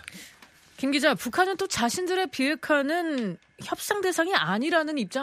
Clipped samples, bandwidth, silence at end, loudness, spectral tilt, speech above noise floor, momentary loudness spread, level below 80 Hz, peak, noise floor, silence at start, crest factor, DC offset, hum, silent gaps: under 0.1%; 15.5 kHz; 0 s; -26 LUFS; -3.5 dB/octave; 28 dB; 10 LU; -64 dBFS; -6 dBFS; -54 dBFS; 0.05 s; 22 dB; under 0.1%; none; none